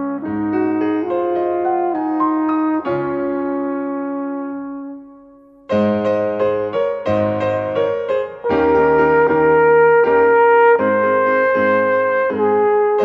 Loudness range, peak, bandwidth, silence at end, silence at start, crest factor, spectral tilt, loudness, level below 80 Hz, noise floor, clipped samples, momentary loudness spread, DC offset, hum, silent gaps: 9 LU; -2 dBFS; 5.6 kHz; 0 s; 0 s; 14 dB; -8.5 dB/octave; -16 LUFS; -50 dBFS; -45 dBFS; under 0.1%; 10 LU; under 0.1%; none; none